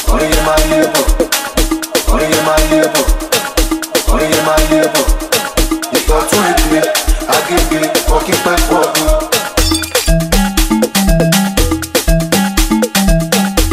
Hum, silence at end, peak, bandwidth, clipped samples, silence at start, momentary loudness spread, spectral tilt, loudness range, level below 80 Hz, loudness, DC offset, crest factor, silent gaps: none; 0 s; 0 dBFS; 16 kHz; under 0.1%; 0 s; 3 LU; -3.5 dB/octave; 1 LU; -16 dBFS; -12 LUFS; under 0.1%; 12 dB; none